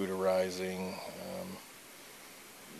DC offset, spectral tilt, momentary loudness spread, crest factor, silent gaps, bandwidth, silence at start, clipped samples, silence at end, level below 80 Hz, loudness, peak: under 0.1%; -4.5 dB/octave; 19 LU; 18 dB; none; 14 kHz; 0 s; under 0.1%; 0 s; -78 dBFS; -36 LUFS; -20 dBFS